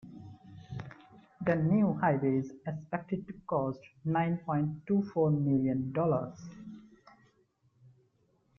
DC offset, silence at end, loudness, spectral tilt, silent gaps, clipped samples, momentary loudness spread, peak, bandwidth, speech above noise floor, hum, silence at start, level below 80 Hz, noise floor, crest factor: under 0.1%; 1.8 s; -31 LUFS; -10 dB/octave; none; under 0.1%; 21 LU; -14 dBFS; 6.6 kHz; 41 dB; none; 0.05 s; -66 dBFS; -71 dBFS; 18 dB